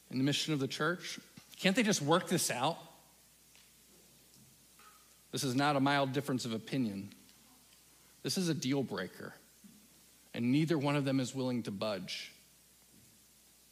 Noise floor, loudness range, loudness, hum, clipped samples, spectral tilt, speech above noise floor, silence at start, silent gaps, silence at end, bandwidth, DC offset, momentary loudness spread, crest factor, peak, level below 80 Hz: -64 dBFS; 6 LU; -34 LUFS; none; under 0.1%; -4.5 dB/octave; 30 dB; 0.1 s; none; 1.4 s; 15.5 kHz; under 0.1%; 15 LU; 24 dB; -12 dBFS; -78 dBFS